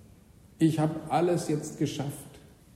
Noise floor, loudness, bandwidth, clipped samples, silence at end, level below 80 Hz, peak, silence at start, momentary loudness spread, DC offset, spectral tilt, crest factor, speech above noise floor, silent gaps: -55 dBFS; -29 LUFS; 15.5 kHz; under 0.1%; 0.35 s; -62 dBFS; -12 dBFS; 0.6 s; 12 LU; under 0.1%; -6.5 dB/octave; 18 dB; 27 dB; none